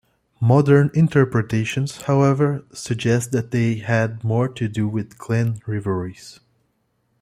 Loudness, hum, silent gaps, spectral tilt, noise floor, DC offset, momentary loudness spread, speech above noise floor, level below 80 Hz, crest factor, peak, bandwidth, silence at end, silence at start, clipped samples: -20 LUFS; none; none; -7 dB/octave; -68 dBFS; under 0.1%; 10 LU; 49 dB; -54 dBFS; 18 dB; -2 dBFS; 13 kHz; 0.9 s; 0.4 s; under 0.1%